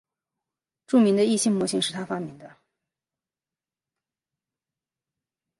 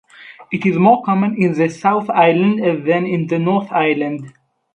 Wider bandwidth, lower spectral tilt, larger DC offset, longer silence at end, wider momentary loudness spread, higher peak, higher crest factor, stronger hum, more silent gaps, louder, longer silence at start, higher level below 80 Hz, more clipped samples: first, 11.5 kHz vs 8.6 kHz; second, -4.5 dB/octave vs -8 dB/octave; neither; first, 3.15 s vs 0.45 s; first, 13 LU vs 7 LU; second, -8 dBFS vs 0 dBFS; about the same, 20 dB vs 16 dB; neither; neither; second, -23 LUFS vs -16 LUFS; first, 0.9 s vs 0.2 s; second, -74 dBFS vs -62 dBFS; neither